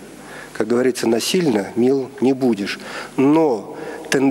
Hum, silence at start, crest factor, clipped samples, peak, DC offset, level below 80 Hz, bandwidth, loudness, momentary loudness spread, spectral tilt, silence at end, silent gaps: none; 0 s; 18 dB; under 0.1%; -2 dBFS; under 0.1%; -60 dBFS; 16 kHz; -19 LUFS; 15 LU; -5 dB/octave; 0 s; none